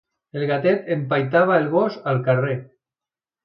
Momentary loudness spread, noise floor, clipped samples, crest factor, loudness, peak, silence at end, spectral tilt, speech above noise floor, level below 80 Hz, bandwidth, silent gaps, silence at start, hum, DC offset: 9 LU; under -90 dBFS; under 0.1%; 18 dB; -21 LUFS; -4 dBFS; 0.8 s; -9.5 dB/octave; over 70 dB; -68 dBFS; 5.8 kHz; none; 0.35 s; none; under 0.1%